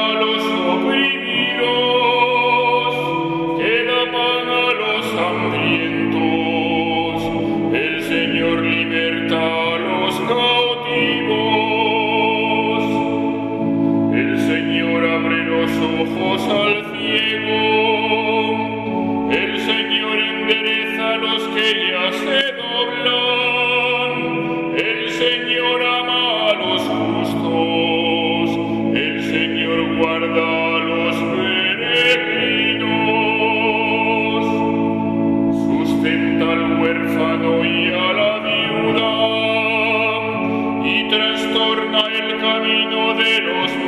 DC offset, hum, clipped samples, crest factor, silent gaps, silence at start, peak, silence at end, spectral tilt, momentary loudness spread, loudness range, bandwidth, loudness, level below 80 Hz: under 0.1%; none; under 0.1%; 16 dB; none; 0 s; -2 dBFS; 0 s; -5 dB/octave; 4 LU; 2 LU; 13.5 kHz; -17 LUFS; -52 dBFS